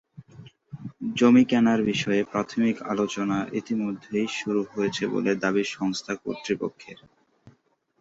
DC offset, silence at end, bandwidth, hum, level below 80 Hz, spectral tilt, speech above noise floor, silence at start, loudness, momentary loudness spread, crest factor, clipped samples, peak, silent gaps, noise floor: under 0.1%; 0.5 s; 7.8 kHz; none; -64 dBFS; -5.5 dB/octave; 41 dB; 0.2 s; -25 LUFS; 14 LU; 18 dB; under 0.1%; -6 dBFS; none; -65 dBFS